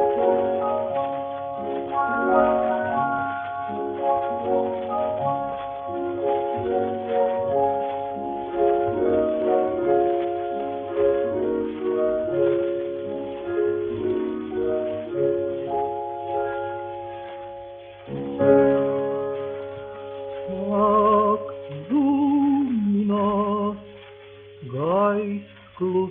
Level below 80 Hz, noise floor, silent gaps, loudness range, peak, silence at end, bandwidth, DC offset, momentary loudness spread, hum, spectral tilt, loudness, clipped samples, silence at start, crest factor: -56 dBFS; -44 dBFS; none; 4 LU; -6 dBFS; 0 s; 3.9 kHz; under 0.1%; 13 LU; none; -11 dB/octave; -24 LUFS; under 0.1%; 0 s; 18 dB